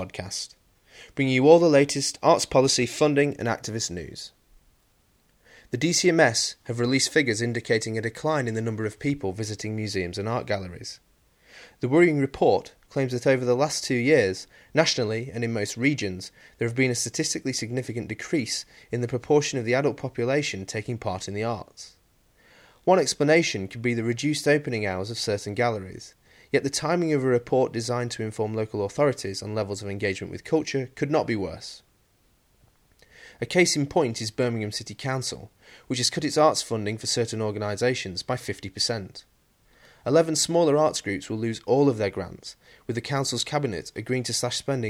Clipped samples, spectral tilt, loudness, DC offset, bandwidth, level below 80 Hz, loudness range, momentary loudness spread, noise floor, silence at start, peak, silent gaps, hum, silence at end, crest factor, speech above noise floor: under 0.1%; -4.5 dB/octave; -25 LUFS; under 0.1%; 16 kHz; -60 dBFS; 5 LU; 13 LU; -64 dBFS; 0 s; -2 dBFS; none; none; 0 s; 22 dB; 39 dB